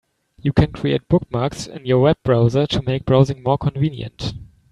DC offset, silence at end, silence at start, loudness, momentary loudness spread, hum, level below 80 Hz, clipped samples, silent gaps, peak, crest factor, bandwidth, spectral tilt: under 0.1%; 0.3 s; 0.45 s; -19 LUFS; 12 LU; none; -40 dBFS; under 0.1%; none; 0 dBFS; 18 dB; 10.5 kHz; -7.5 dB/octave